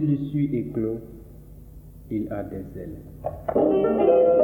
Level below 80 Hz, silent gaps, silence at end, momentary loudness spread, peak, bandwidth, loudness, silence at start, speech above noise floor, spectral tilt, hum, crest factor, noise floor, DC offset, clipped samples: -48 dBFS; none; 0 s; 19 LU; -8 dBFS; 19 kHz; -24 LUFS; 0 s; 21 dB; -10.5 dB/octave; none; 16 dB; -44 dBFS; under 0.1%; under 0.1%